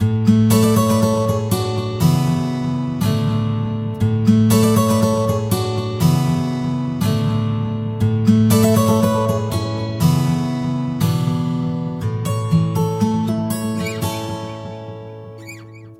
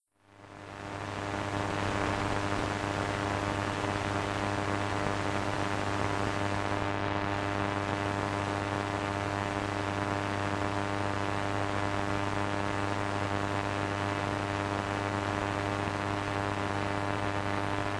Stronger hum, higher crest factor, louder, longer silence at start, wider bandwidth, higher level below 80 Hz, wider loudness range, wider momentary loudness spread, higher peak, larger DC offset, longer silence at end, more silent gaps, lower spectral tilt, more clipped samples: neither; about the same, 16 dB vs 20 dB; first, -18 LUFS vs -32 LUFS; second, 0 s vs 0.3 s; first, 16.5 kHz vs 11 kHz; first, -44 dBFS vs -50 dBFS; first, 4 LU vs 1 LU; first, 10 LU vs 1 LU; first, -2 dBFS vs -12 dBFS; neither; about the same, 0.05 s vs 0 s; neither; about the same, -6.5 dB/octave vs -5.5 dB/octave; neither